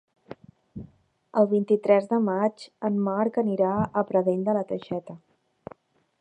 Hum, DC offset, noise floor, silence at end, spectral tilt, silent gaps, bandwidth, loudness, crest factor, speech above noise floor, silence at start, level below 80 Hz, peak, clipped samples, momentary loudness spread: none; under 0.1%; -55 dBFS; 1.05 s; -8.5 dB/octave; none; 9.2 kHz; -25 LUFS; 20 dB; 31 dB; 0.3 s; -62 dBFS; -6 dBFS; under 0.1%; 23 LU